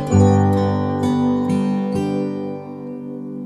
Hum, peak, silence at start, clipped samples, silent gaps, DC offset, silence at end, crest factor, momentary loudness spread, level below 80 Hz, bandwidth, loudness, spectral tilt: 50 Hz at -45 dBFS; -2 dBFS; 0 s; under 0.1%; none; under 0.1%; 0 s; 16 dB; 16 LU; -48 dBFS; 11.5 kHz; -18 LUFS; -8 dB/octave